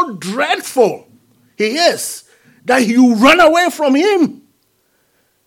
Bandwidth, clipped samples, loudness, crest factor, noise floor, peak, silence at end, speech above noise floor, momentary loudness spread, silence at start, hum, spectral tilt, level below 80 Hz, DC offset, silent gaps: 17.5 kHz; under 0.1%; -13 LUFS; 14 dB; -60 dBFS; 0 dBFS; 1.1 s; 48 dB; 14 LU; 0 s; none; -3.5 dB/octave; -52 dBFS; under 0.1%; none